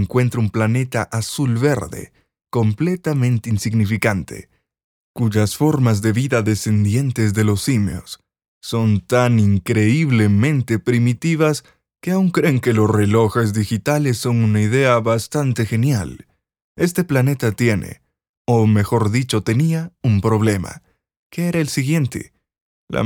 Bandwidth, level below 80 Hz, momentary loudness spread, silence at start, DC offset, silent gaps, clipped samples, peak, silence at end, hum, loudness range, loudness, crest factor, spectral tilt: 17.5 kHz; -50 dBFS; 9 LU; 0 s; under 0.1%; 4.84-5.14 s, 8.48-8.61 s, 16.62-16.75 s, 18.29-18.45 s, 21.17-21.30 s, 22.61-22.87 s; under 0.1%; -2 dBFS; 0 s; none; 3 LU; -18 LUFS; 16 dB; -6.5 dB/octave